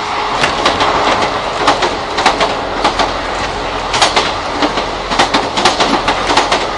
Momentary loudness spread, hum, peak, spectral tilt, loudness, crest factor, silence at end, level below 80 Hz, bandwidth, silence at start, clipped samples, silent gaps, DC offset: 5 LU; none; 0 dBFS; -2.5 dB/octave; -13 LUFS; 14 dB; 0 s; -32 dBFS; 12 kHz; 0 s; under 0.1%; none; under 0.1%